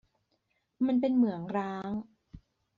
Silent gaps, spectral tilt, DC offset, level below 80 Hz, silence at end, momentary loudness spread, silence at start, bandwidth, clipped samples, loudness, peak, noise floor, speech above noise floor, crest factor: none; -7 dB/octave; under 0.1%; -66 dBFS; 0.4 s; 11 LU; 0.8 s; 5 kHz; under 0.1%; -31 LUFS; -16 dBFS; -77 dBFS; 48 dB; 16 dB